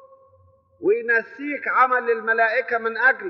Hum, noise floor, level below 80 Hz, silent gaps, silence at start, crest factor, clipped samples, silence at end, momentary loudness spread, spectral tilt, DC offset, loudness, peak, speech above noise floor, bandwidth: none; -57 dBFS; -78 dBFS; none; 0.8 s; 16 dB; under 0.1%; 0 s; 8 LU; -1 dB/octave; under 0.1%; -21 LUFS; -6 dBFS; 36 dB; 6 kHz